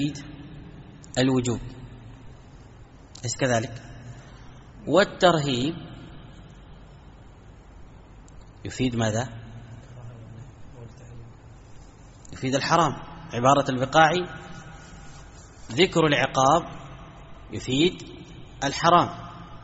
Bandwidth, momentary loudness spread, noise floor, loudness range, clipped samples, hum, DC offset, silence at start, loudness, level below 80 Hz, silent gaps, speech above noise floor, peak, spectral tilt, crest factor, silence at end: 8 kHz; 25 LU; -47 dBFS; 10 LU; under 0.1%; none; under 0.1%; 0 s; -23 LUFS; -48 dBFS; none; 25 dB; -4 dBFS; -4 dB/octave; 24 dB; 0 s